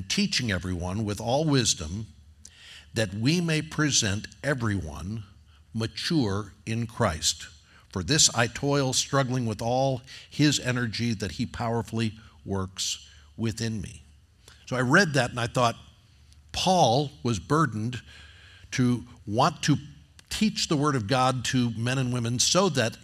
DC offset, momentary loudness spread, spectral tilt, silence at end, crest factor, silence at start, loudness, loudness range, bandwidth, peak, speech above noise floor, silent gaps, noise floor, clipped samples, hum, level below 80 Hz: under 0.1%; 14 LU; -4 dB/octave; 0.05 s; 22 dB; 0 s; -26 LUFS; 5 LU; 15 kHz; -6 dBFS; 29 dB; none; -55 dBFS; under 0.1%; none; -52 dBFS